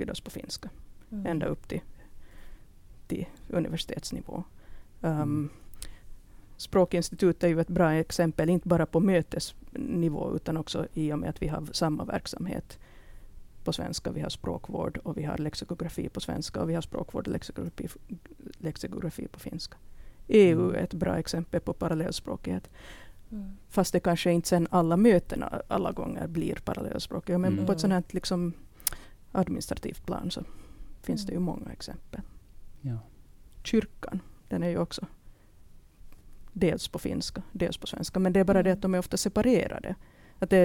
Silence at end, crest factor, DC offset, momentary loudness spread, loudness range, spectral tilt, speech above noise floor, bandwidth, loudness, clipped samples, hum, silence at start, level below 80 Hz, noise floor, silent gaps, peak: 0 s; 28 dB; under 0.1%; 16 LU; 9 LU; -6 dB/octave; 23 dB; 19 kHz; -30 LUFS; under 0.1%; none; 0 s; -48 dBFS; -52 dBFS; none; -2 dBFS